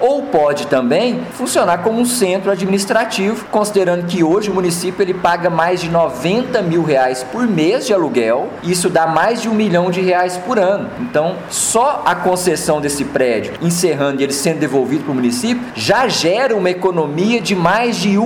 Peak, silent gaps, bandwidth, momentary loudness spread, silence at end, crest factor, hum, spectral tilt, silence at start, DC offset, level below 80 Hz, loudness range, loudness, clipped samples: -2 dBFS; none; 17 kHz; 4 LU; 0 s; 14 dB; none; -4.5 dB/octave; 0 s; under 0.1%; -50 dBFS; 1 LU; -15 LUFS; under 0.1%